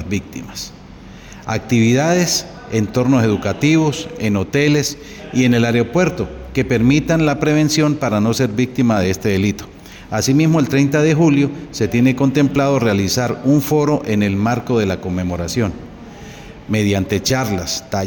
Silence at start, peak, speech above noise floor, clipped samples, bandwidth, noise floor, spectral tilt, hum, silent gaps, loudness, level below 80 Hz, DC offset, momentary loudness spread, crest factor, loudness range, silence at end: 0 s; -2 dBFS; 21 dB; under 0.1%; over 20 kHz; -37 dBFS; -5.5 dB/octave; none; none; -16 LUFS; -42 dBFS; under 0.1%; 12 LU; 14 dB; 4 LU; 0 s